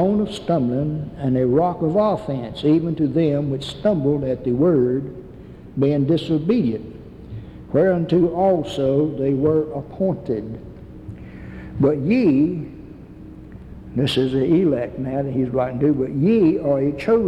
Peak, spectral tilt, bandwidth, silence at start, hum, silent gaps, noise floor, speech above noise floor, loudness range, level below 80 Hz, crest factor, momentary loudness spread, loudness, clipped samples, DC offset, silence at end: -6 dBFS; -8.5 dB/octave; 11 kHz; 0 s; none; none; -39 dBFS; 20 dB; 3 LU; -46 dBFS; 14 dB; 20 LU; -20 LUFS; under 0.1%; under 0.1%; 0 s